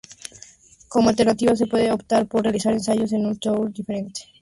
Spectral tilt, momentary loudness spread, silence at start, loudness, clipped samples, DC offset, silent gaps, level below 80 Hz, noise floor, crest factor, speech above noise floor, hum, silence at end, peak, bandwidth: -5.5 dB/octave; 12 LU; 0.1 s; -21 LUFS; under 0.1%; under 0.1%; none; -54 dBFS; -48 dBFS; 14 dB; 28 dB; none; 0.2 s; -6 dBFS; 11.5 kHz